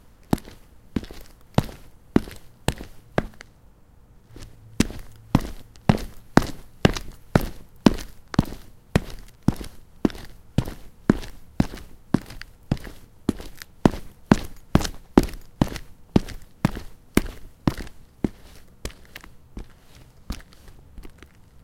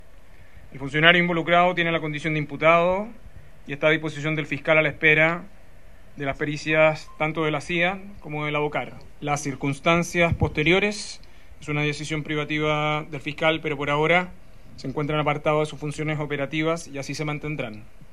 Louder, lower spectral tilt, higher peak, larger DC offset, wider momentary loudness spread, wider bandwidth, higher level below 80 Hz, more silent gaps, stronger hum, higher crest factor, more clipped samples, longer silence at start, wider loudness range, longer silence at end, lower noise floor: second, -26 LUFS vs -23 LUFS; first, -6.5 dB/octave vs -5 dB/octave; about the same, 0 dBFS vs 0 dBFS; second, under 0.1% vs 0.9%; first, 21 LU vs 14 LU; first, 17 kHz vs 12.5 kHz; first, -36 dBFS vs -48 dBFS; neither; neither; about the same, 26 dB vs 24 dB; neither; second, 0.3 s vs 0.55 s; first, 7 LU vs 4 LU; first, 0.55 s vs 0.1 s; about the same, -51 dBFS vs -50 dBFS